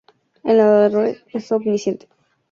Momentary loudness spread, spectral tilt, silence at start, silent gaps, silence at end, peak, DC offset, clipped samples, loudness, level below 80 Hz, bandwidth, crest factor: 15 LU; -6.5 dB/octave; 0.45 s; none; 0.55 s; -2 dBFS; under 0.1%; under 0.1%; -17 LUFS; -66 dBFS; 7.2 kHz; 16 dB